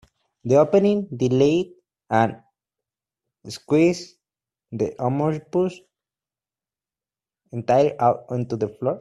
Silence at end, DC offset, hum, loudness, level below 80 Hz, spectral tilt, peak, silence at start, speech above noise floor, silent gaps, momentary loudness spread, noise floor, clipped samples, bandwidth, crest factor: 0 s; under 0.1%; none; -21 LUFS; -62 dBFS; -7 dB/octave; -4 dBFS; 0.45 s; over 69 dB; none; 17 LU; under -90 dBFS; under 0.1%; 12 kHz; 20 dB